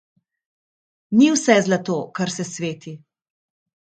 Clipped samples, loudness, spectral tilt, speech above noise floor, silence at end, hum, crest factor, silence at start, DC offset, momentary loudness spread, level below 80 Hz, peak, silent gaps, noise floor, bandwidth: under 0.1%; -19 LUFS; -4.5 dB/octave; over 71 dB; 1 s; none; 22 dB; 1.1 s; under 0.1%; 13 LU; -68 dBFS; 0 dBFS; none; under -90 dBFS; 9.4 kHz